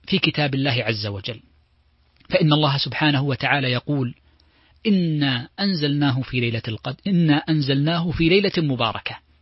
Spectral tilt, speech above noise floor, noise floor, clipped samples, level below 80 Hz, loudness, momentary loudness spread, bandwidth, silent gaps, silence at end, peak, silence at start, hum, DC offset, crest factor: -9.5 dB/octave; 40 dB; -60 dBFS; under 0.1%; -48 dBFS; -21 LUFS; 10 LU; 5.8 kHz; none; 0.25 s; -2 dBFS; 0.1 s; none; under 0.1%; 20 dB